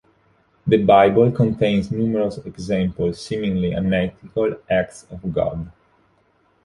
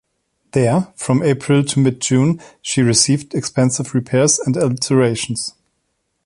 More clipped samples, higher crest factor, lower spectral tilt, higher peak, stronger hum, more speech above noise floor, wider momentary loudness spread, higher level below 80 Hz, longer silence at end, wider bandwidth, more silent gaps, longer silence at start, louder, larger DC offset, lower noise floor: neither; about the same, 18 dB vs 16 dB; first, -7.5 dB/octave vs -5 dB/octave; about the same, -2 dBFS vs 0 dBFS; neither; second, 42 dB vs 54 dB; first, 15 LU vs 8 LU; first, -44 dBFS vs -52 dBFS; first, 0.95 s vs 0.75 s; about the same, 11.5 kHz vs 11.5 kHz; neither; about the same, 0.65 s vs 0.55 s; second, -20 LUFS vs -16 LUFS; neither; second, -61 dBFS vs -70 dBFS